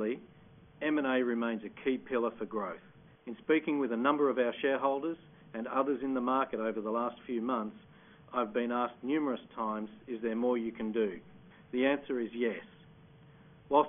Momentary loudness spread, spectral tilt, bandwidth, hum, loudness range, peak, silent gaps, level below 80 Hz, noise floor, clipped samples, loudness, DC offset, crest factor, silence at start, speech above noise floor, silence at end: 12 LU; -1 dB/octave; 3.7 kHz; none; 3 LU; -14 dBFS; none; -72 dBFS; -58 dBFS; under 0.1%; -33 LUFS; under 0.1%; 20 dB; 0 s; 25 dB; 0 s